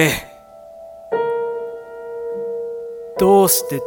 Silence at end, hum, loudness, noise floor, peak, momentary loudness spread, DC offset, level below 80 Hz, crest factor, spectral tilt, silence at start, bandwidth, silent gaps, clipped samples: 0 s; none; -19 LUFS; -41 dBFS; 0 dBFS; 24 LU; under 0.1%; -50 dBFS; 20 dB; -4 dB/octave; 0 s; 17.5 kHz; none; under 0.1%